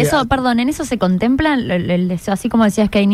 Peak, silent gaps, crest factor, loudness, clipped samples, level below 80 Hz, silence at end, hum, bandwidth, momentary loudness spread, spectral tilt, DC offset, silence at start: -2 dBFS; none; 12 dB; -16 LUFS; under 0.1%; -36 dBFS; 0 s; none; 15 kHz; 4 LU; -6 dB/octave; under 0.1%; 0 s